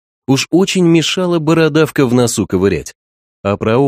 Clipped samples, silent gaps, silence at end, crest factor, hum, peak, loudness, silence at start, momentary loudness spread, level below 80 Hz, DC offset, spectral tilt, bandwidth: under 0.1%; 2.95-3.44 s; 0 s; 14 dB; none; 0 dBFS; -13 LUFS; 0.3 s; 8 LU; -44 dBFS; under 0.1%; -5.5 dB/octave; 15.5 kHz